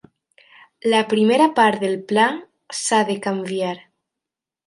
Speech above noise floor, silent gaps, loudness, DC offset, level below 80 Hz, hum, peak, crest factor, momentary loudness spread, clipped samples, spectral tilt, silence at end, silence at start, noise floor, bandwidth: 68 dB; none; -19 LUFS; under 0.1%; -70 dBFS; none; -2 dBFS; 18 dB; 12 LU; under 0.1%; -4 dB/octave; 0.9 s; 0.85 s; -86 dBFS; 11.5 kHz